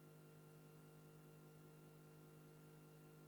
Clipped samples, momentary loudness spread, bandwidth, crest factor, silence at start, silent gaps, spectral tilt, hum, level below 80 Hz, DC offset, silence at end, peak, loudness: under 0.1%; 0 LU; over 20 kHz; 12 dB; 0 s; none; -6 dB/octave; none; -86 dBFS; under 0.1%; 0 s; -52 dBFS; -64 LUFS